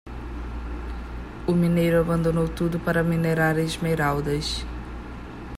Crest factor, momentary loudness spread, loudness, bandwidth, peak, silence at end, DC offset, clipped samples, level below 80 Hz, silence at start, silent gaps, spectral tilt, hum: 16 dB; 16 LU; -24 LUFS; 15.5 kHz; -8 dBFS; 0 s; under 0.1%; under 0.1%; -36 dBFS; 0.05 s; none; -6.5 dB/octave; none